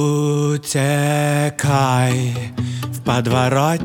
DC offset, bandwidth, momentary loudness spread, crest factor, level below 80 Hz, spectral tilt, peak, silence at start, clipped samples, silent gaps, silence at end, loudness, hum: under 0.1%; 17.5 kHz; 8 LU; 16 dB; -52 dBFS; -5.5 dB/octave; -2 dBFS; 0 s; under 0.1%; none; 0 s; -18 LUFS; none